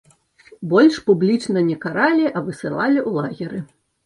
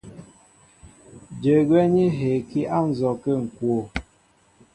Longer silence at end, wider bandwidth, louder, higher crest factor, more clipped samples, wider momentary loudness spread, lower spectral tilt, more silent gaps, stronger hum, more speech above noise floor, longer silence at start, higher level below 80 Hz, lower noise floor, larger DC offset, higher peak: second, 0.4 s vs 0.75 s; about the same, 11.5 kHz vs 10.5 kHz; first, -19 LUFS vs -22 LUFS; about the same, 16 dB vs 16 dB; neither; first, 14 LU vs 10 LU; second, -6.5 dB/octave vs -8.5 dB/octave; neither; neither; second, 32 dB vs 39 dB; first, 0.6 s vs 0.05 s; second, -62 dBFS vs -50 dBFS; second, -50 dBFS vs -60 dBFS; neither; about the same, -4 dBFS vs -6 dBFS